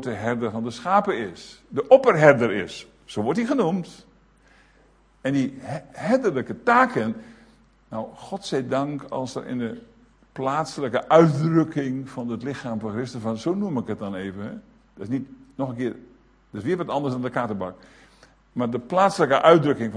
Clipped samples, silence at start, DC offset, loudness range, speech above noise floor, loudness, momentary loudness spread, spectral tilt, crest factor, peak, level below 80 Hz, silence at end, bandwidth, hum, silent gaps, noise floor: under 0.1%; 0 s; under 0.1%; 9 LU; 35 dB; -23 LUFS; 18 LU; -6.5 dB/octave; 24 dB; 0 dBFS; -60 dBFS; 0 s; 10.5 kHz; none; none; -57 dBFS